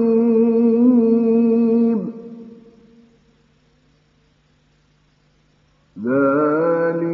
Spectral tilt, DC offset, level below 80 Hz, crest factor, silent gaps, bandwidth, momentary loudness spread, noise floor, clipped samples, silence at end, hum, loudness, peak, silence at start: -11 dB/octave; under 0.1%; -64 dBFS; 14 dB; none; 4.3 kHz; 16 LU; -59 dBFS; under 0.1%; 0 s; none; -16 LUFS; -6 dBFS; 0 s